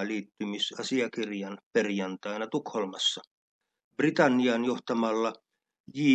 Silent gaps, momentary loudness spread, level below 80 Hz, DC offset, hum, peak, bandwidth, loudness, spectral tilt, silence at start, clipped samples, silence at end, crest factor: 1.63-1.71 s, 3.27-3.61 s, 3.84-3.91 s, 5.80-5.84 s; 11 LU; -82 dBFS; under 0.1%; none; -10 dBFS; 9 kHz; -29 LUFS; -4.5 dB/octave; 0 s; under 0.1%; 0 s; 20 dB